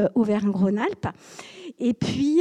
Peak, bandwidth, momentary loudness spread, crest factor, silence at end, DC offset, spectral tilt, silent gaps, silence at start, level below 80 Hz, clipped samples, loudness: -10 dBFS; 10 kHz; 19 LU; 14 dB; 0 s; under 0.1%; -7 dB/octave; none; 0 s; -56 dBFS; under 0.1%; -24 LUFS